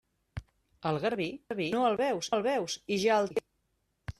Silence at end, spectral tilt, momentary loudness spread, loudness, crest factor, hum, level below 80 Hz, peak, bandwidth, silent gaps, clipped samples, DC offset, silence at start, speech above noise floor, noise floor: 0.1 s; -4.5 dB/octave; 19 LU; -31 LUFS; 16 dB; none; -58 dBFS; -16 dBFS; 13.5 kHz; none; under 0.1%; under 0.1%; 0.35 s; 47 dB; -77 dBFS